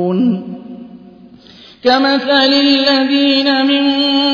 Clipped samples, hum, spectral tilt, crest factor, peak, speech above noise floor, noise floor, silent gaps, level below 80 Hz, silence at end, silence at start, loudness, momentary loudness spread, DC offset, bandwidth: under 0.1%; none; -5.5 dB/octave; 14 dB; 0 dBFS; 28 dB; -40 dBFS; none; -58 dBFS; 0 s; 0 s; -12 LUFS; 18 LU; under 0.1%; 5.4 kHz